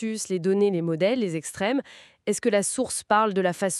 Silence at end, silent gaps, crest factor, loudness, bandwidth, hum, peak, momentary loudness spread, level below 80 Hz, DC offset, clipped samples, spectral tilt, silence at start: 0 s; none; 18 dB; -25 LUFS; 13.5 kHz; none; -6 dBFS; 7 LU; -66 dBFS; under 0.1%; under 0.1%; -4.5 dB/octave; 0 s